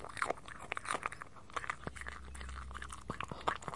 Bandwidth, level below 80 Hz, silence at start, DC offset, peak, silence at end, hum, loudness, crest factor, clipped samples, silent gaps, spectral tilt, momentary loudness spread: 11.5 kHz; -54 dBFS; 0 s; 0.2%; -14 dBFS; 0 s; none; -43 LUFS; 28 dB; under 0.1%; none; -3.5 dB/octave; 8 LU